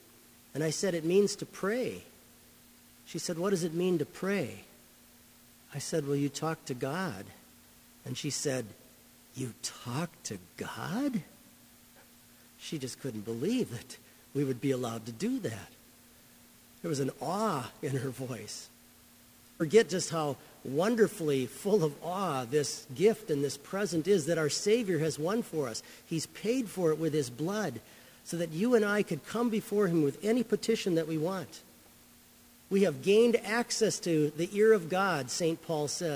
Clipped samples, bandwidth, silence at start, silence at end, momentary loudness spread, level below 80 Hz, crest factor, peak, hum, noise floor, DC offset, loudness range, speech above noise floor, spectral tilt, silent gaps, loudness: under 0.1%; 16 kHz; 0.55 s; 0 s; 14 LU; -70 dBFS; 22 dB; -10 dBFS; none; -58 dBFS; under 0.1%; 8 LU; 27 dB; -5 dB/octave; none; -31 LUFS